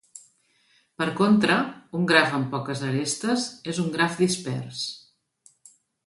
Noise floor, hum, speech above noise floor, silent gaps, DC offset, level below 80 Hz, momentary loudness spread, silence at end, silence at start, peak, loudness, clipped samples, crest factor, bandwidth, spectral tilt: -64 dBFS; none; 40 dB; none; under 0.1%; -68 dBFS; 12 LU; 1.1 s; 0.15 s; -4 dBFS; -24 LUFS; under 0.1%; 22 dB; 11.5 kHz; -4.5 dB/octave